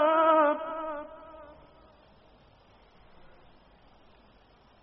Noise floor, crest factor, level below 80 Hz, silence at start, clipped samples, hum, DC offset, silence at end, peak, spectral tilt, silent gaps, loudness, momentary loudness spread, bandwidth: -60 dBFS; 20 dB; -64 dBFS; 0 s; under 0.1%; none; under 0.1%; 3.4 s; -12 dBFS; -2 dB/octave; none; -26 LUFS; 28 LU; 5.4 kHz